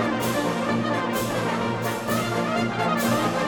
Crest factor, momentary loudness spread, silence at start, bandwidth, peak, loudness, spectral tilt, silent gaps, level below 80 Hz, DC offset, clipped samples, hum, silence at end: 14 dB; 3 LU; 0 s; 19 kHz; -10 dBFS; -24 LUFS; -5 dB/octave; none; -52 dBFS; under 0.1%; under 0.1%; none; 0 s